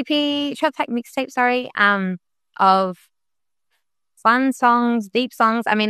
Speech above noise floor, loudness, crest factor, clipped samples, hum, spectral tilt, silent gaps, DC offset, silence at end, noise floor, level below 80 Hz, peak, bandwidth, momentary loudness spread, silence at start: 68 dB; -19 LUFS; 18 dB; under 0.1%; none; -5 dB/octave; none; under 0.1%; 0 s; -87 dBFS; -68 dBFS; -2 dBFS; 13 kHz; 9 LU; 0 s